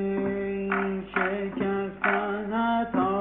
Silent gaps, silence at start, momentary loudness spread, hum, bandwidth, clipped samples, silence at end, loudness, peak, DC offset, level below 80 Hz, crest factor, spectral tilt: none; 0 s; 3 LU; none; 4 kHz; under 0.1%; 0 s; -27 LUFS; -10 dBFS; under 0.1%; -56 dBFS; 16 dB; -5 dB/octave